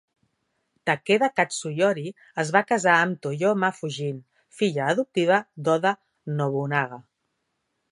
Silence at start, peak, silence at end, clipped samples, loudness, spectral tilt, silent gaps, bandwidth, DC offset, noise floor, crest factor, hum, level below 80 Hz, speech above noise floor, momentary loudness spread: 0.85 s; -2 dBFS; 0.9 s; under 0.1%; -24 LUFS; -5 dB/octave; none; 11.5 kHz; under 0.1%; -77 dBFS; 22 dB; none; -76 dBFS; 53 dB; 11 LU